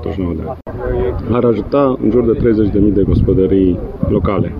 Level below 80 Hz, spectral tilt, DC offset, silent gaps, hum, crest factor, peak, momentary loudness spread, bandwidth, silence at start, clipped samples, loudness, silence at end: -26 dBFS; -11 dB/octave; 0.2%; none; none; 12 dB; -2 dBFS; 8 LU; 5.4 kHz; 0 s; under 0.1%; -14 LUFS; 0 s